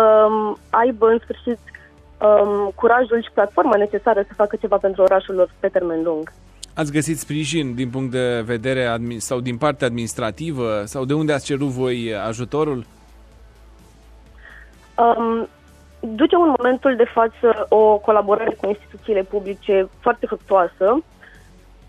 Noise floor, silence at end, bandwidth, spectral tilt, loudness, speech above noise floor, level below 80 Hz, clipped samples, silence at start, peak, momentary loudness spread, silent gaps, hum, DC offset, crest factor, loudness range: -46 dBFS; 0.85 s; 14 kHz; -5.5 dB/octave; -19 LUFS; 28 dB; -48 dBFS; under 0.1%; 0 s; -4 dBFS; 10 LU; none; none; under 0.1%; 16 dB; 7 LU